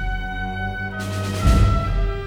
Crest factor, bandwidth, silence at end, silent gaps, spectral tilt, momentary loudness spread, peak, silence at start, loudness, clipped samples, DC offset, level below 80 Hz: 16 dB; 14 kHz; 0 s; none; -6 dB/octave; 10 LU; -4 dBFS; 0 s; -22 LUFS; under 0.1%; 0.1%; -22 dBFS